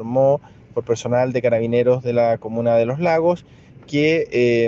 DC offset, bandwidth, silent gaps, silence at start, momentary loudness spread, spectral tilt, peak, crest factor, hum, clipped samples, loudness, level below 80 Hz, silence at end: under 0.1%; 7.8 kHz; none; 0 s; 7 LU; -7 dB/octave; -6 dBFS; 14 dB; none; under 0.1%; -19 LUFS; -56 dBFS; 0 s